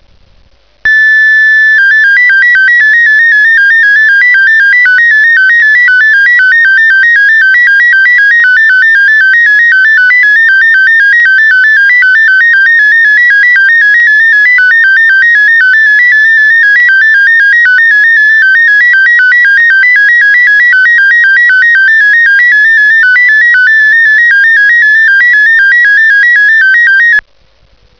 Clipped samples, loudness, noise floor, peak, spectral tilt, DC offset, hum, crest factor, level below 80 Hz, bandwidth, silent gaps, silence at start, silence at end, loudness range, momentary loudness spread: under 0.1%; -2 LUFS; -46 dBFS; 0 dBFS; 1 dB/octave; 0.4%; 50 Hz at -55 dBFS; 4 dB; -50 dBFS; 5.4 kHz; none; 0.85 s; 0.8 s; 0 LU; 0 LU